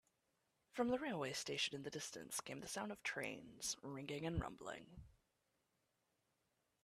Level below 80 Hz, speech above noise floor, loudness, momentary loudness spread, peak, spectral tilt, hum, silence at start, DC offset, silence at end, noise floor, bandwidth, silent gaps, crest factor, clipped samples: -64 dBFS; 40 dB; -45 LUFS; 11 LU; -28 dBFS; -3.5 dB/octave; none; 0.75 s; under 0.1%; 1.75 s; -86 dBFS; 14.5 kHz; none; 20 dB; under 0.1%